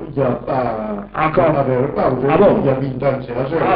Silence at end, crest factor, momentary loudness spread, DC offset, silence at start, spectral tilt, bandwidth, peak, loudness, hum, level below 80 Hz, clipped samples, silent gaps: 0 s; 14 dB; 9 LU; under 0.1%; 0 s; -12.5 dB/octave; 5.2 kHz; -2 dBFS; -17 LUFS; none; -40 dBFS; under 0.1%; none